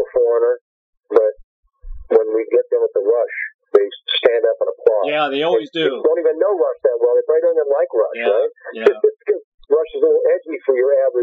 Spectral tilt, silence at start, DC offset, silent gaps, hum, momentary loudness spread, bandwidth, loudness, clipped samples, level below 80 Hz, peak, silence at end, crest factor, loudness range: -1.5 dB/octave; 0 s; under 0.1%; 0.61-0.93 s, 1.44-1.63 s, 3.54-3.59 s, 9.44-9.58 s; none; 4 LU; 4.7 kHz; -17 LUFS; under 0.1%; -48 dBFS; -2 dBFS; 0 s; 16 dB; 2 LU